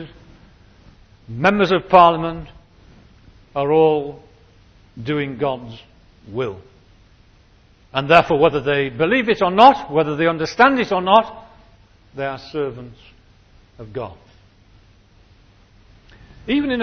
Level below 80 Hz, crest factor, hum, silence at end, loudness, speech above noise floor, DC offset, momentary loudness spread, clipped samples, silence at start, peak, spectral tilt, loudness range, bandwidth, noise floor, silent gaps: -48 dBFS; 20 dB; none; 0 s; -17 LUFS; 35 dB; under 0.1%; 21 LU; under 0.1%; 0 s; 0 dBFS; -6.5 dB/octave; 16 LU; 8 kHz; -52 dBFS; none